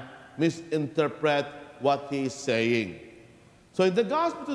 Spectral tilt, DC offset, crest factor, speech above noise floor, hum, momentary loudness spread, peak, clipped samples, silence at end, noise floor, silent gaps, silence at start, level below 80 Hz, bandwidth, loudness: -5.5 dB/octave; under 0.1%; 18 dB; 28 dB; none; 12 LU; -10 dBFS; under 0.1%; 0 s; -55 dBFS; none; 0 s; -68 dBFS; 11 kHz; -27 LUFS